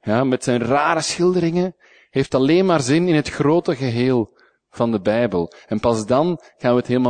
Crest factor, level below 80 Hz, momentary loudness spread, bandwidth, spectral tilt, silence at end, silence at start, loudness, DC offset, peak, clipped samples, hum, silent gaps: 16 dB; -50 dBFS; 7 LU; 9.6 kHz; -6 dB/octave; 0 s; 0.05 s; -19 LUFS; under 0.1%; -2 dBFS; under 0.1%; none; none